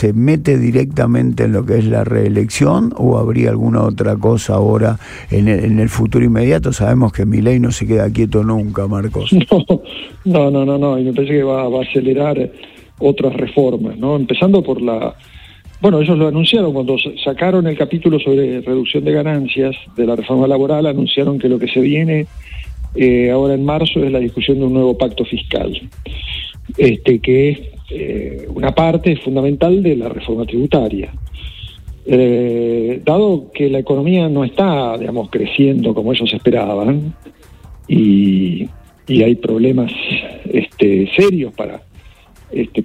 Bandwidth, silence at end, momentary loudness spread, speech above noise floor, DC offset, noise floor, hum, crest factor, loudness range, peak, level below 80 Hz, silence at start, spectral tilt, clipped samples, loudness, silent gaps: 13.5 kHz; 0 s; 10 LU; 28 dB; under 0.1%; -42 dBFS; none; 14 dB; 2 LU; 0 dBFS; -34 dBFS; 0 s; -7 dB/octave; under 0.1%; -14 LUFS; none